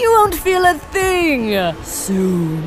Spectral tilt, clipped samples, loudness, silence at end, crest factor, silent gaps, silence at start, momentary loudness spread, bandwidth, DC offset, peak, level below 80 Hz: -4.5 dB/octave; under 0.1%; -16 LUFS; 0 s; 14 dB; none; 0 s; 7 LU; 16 kHz; under 0.1%; -2 dBFS; -36 dBFS